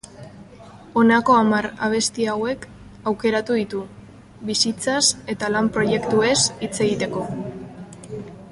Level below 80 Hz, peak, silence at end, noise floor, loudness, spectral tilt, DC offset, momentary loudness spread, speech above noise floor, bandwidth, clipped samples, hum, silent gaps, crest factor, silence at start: -52 dBFS; -4 dBFS; 0 s; -43 dBFS; -20 LUFS; -3.5 dB/octave; under 0.1%; 19 LU; 23 dB; 11.5 kHz; under 0.1%; none; none; 18 dB; 0.05 s